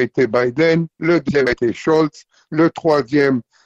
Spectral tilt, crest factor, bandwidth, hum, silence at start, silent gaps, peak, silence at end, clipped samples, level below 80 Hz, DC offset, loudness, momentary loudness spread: -7 dB/octave; 12 dB; 8 kHz; none; 0 s; none; -4 dBFS; 0.25 s; under 0.1%; -50 dBFS; under 0.1%; -17 LUFS; 3 LU